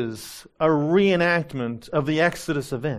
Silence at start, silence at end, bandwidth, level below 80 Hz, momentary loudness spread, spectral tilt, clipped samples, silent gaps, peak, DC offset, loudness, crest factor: 0 s; 0 s; 15 kHz; -54 dBFS; 12 LU; -6 dB/octave; under 0.1%; none; -6 dBFS; under 0.1%; -22 LUFS; 16 dB